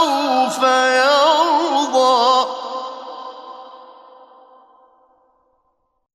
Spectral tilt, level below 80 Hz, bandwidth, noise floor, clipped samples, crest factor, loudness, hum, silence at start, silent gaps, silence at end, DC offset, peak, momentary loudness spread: -1 dB/octave; -76 dBFS; 13.5 kHz; -67 dBFS; under 0.1%; 16 dB; -15 LUFS; none; 0 s; none; 2.3 s; under 0.1%; -2 dBFS; 21 LU